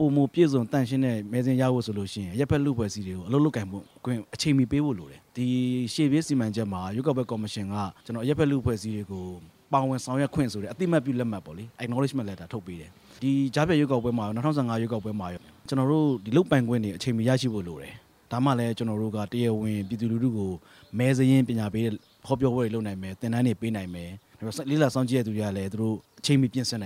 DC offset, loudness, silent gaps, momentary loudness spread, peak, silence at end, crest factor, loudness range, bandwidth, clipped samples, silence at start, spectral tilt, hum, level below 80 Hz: under 0.1%; -27 LUFS; none; 13 LU; -8 dBFS; 0 s; 20 dB; 3 LU; 15.5 kHz; under 0.1%; 0 s; -6.5 dB/octave; none; -56 dBFS